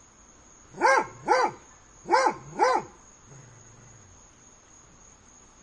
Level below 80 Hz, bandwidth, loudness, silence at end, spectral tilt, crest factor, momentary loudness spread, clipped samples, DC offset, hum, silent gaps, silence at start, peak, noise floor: -62 dBFS; 11 kHz; -25 LUFS; 2.75 s; -3 dB/octave; 20 dB; 24 LU; under 0.1%; under 0.1%; none; none; 0.75 s; -8 dBFS; -54 dBFS